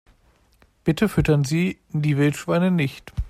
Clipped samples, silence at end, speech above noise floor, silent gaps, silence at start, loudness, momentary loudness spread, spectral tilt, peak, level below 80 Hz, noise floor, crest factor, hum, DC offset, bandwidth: under 0.1%; 0 s; 38 dB; none; 0.85 s; -22 LUFS; 6 LU; -7 dB/octave; -6 dBFS; -38 dBFS; -59 dBFS; 16 dB; none; under 0.1%; 15 kHz